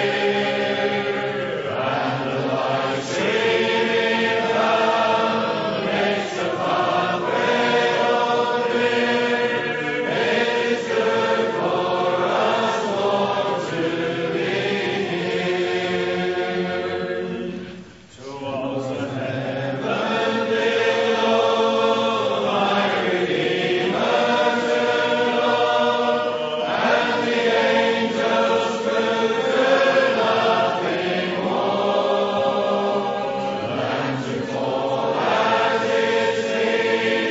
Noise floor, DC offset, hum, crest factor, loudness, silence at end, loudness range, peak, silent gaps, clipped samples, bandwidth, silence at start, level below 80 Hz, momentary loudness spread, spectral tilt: -41 dBFS; under 0.1%; none; 16 dB; -20 LUFS; 0 s; 4 LU; -6 dBFS; none; under 0.1%; 8 kHz; 0 s; -64 dBFS; 6 LU; -4.5 dB/octave